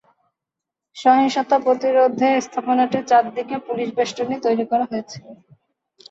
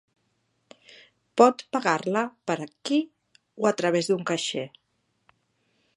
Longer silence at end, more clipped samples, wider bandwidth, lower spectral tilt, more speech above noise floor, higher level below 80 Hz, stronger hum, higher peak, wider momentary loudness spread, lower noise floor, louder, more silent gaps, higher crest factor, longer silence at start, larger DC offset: second, 0.75 s vs 1.3 s; neither; second, 8 kHz vs 11.5 kHz; about the same, -4.5 dB/octave vs -4.5 dB/octave; first, 66 dB vs 48 dB; first, -68 dBFS vs -78 dBFS; neither; about the same, -4 dBFS vs -4 dBFS; about the same, 10 LU vs 12 LU; first, -85 dBFS vs -73 dBFS; first, -19 LUFS vs -25 LUFS; neither; second, 16 dB vs 24 dB; second, 0.95 s vs 1.35 s; neither